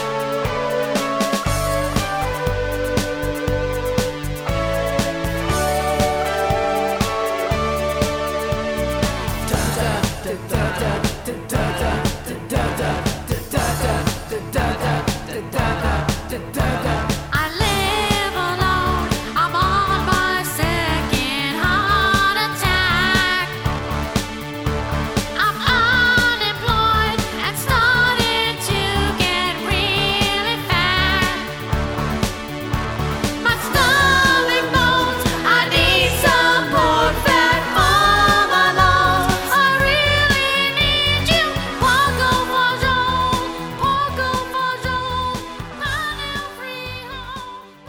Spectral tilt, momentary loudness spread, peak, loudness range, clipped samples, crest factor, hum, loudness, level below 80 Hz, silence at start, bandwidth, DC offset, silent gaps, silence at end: -4 dB/octave; 10 LU; -2 dBFS; 7 LU; under 0.1%; 16 dB; none; -18 LUFS; -30 dBFS; 0 s; 19.5 kHz; under 0.1%; none; 0 s